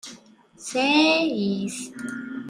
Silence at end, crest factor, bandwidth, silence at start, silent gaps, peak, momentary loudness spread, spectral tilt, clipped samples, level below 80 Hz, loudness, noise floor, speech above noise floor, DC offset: 0 s; 18 dB; 15 kHz; 0.05 s; none; -6 dBFS; 17 LU; -3.5 dB/octave; under 0.1%; -68 dBFS; -22 LUFS; -49 dBFS; 26 dB; under 0.1%